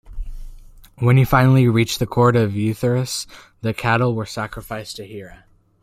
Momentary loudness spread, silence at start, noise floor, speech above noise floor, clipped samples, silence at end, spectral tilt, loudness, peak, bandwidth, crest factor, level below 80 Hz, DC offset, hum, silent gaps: 21 LU; 0.1 s; -41 dBFS; 23 dB; under 0.1%; 0.55 s; -6.5 dB/octave; -18 LUFS; -2 dBFS; 15.5 kHz; 18 dB; -38 dBFS; under 0.1%; none; none